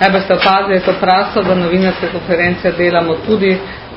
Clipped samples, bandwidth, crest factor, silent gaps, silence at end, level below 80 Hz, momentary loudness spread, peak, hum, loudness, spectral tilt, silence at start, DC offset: under 0.1%; 5.8 kHz; 12 dB; none; 0 s; -40 dBFS; 4 LU; 0 dBFS; none; -13 LUFS; -8 dB/octave; 0 s; under 0.1%